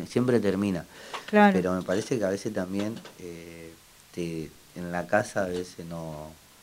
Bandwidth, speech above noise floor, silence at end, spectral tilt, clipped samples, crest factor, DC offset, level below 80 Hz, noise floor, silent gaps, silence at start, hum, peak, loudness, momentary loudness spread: 16 kHz; 23 dB; 0.3 s; -6 dB/octave; under 0.1%; 22 dB; under 0.1%; -60 dBFS; -51 dBFS; none; 0 s; none; -6 dBFS; -27 LUFS; 21 LU